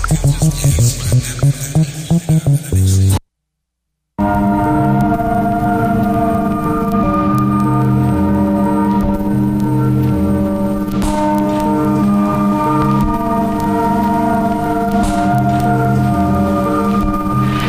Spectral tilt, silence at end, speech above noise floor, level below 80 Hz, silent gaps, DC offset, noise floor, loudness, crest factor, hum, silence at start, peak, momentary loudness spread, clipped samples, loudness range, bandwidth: -7 dB/octave; 0 s; 61 dB; -28 dBFS; none; 0.3%; -74 dBFS; -14 LUFS; 12 dB; none; 0 s; -2 dBFS; 3 LU; under 0.1%; 1 LU; 15.5 kHz